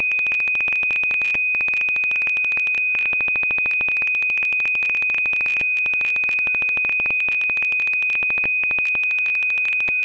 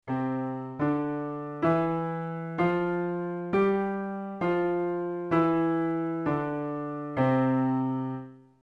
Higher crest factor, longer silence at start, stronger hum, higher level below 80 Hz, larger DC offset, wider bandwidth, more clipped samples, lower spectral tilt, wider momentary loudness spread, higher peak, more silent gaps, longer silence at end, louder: second, 4 dB vs 16 dB; about the same, 0 s vs 0.05 s; neither; first, -56 dBFS vs -62 dBFS; neither; first, 8 kHz vs 5.4 kHz; neither; second, -2.5 dB/octave vs -9.5 dB/octave; second, 0 LU vs 9 LU; second, -16 dBFS vs -12 dBFS; neither; second, 0 s vs 0.25 s; first, -17 LUFS vs -29 LUFS